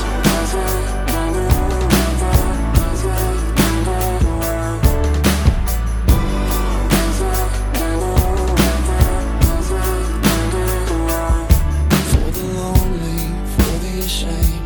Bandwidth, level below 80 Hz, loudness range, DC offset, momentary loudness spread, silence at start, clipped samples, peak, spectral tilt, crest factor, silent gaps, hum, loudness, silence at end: 19.5 kHz; -18 dBFS; 1 LU; under 0.1%; 4 LU; 0 s; under 0.1%; 0 dBFS; -5.5 dB/octave; 16 dB; none; none; -18 LUFS; 0 s